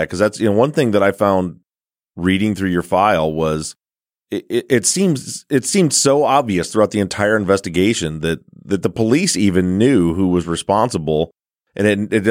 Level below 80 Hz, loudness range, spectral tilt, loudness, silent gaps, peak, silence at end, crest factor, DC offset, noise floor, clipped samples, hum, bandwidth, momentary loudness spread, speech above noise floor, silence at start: -46 dBFS; 3 LU; -4.5 dB/octave; -16 LUFS; none; 0 dBFS; 0 s; 16 dB; under 0.1%; under -90 dBFS; under 0.1%; none; 16.5 kHz; 8 LU; over 74 dB; 0 s